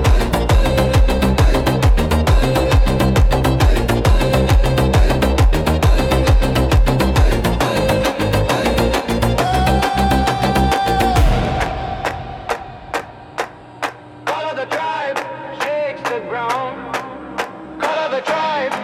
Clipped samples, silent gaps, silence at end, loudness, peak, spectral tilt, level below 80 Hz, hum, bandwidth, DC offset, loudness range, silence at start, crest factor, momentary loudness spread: under 0.1%; none; 0 s; -17 LUFS; -4 dBFS; -6 dB/octave; -20 dBFS; none; 16.5 kHz; under 0.1%; 8 LU; 0 s; 12 dB; 11 LU